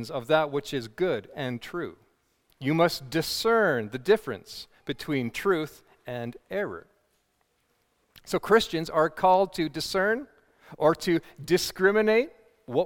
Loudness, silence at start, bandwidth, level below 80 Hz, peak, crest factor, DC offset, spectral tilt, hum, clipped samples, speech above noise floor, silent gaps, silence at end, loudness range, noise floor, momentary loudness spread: -26 LUFS; 0 s; 18 kHz; -60 dBFS; -8 dBFS; 20 dB; under 0.1%; -5 dB/octave; none; under 0.1%; 46 dB; none; 0 s; 7 LU; -72 dBFS; 14 LU